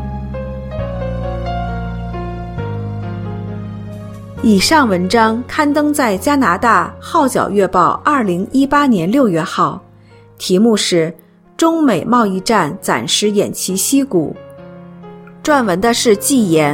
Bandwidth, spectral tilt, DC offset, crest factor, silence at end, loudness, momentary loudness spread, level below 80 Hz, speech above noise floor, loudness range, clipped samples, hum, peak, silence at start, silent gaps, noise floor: 16.5 kHz; -4.5 dB/octave; under 0.1%; 14 dB; 0 s; -15 LUFS; 13 LU; -34 dBFS; 29 dB; 10 LU; under 0.1%; none; 0 dBFS; 0 s; none; -42 dBFS